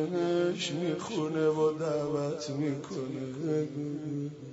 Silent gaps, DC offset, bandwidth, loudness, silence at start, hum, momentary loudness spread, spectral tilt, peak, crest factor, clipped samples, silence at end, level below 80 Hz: none; under 0.1%; 8 kHz; -32 LUFS; 0 s; none; 8 LU; -6 dB/octave; -18 dBFS; 14 dB; under 0.1%; 0 s; -72 dBFS